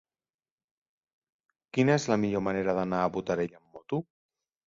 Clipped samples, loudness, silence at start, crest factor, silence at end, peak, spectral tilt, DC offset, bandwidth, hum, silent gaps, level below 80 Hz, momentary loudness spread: under 0.1%; -29 LUFS; 1.75 s; 20 dB; 0.65 s; -10 dBFS; -6.5 dB/octave; under 0.1%; 7.8 kHz; none; none; -62 dBFS; 10 LU